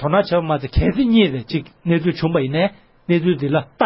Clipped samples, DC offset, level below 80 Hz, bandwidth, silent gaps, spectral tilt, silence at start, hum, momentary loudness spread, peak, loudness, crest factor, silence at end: under 0.1%; under 0.1%; -32 dBFS; 5.8 kHz; none; -12 dB/octave; 0 s; none; 8 LU; -2 dBFS; -19 LUFS; 16 dB; 0 s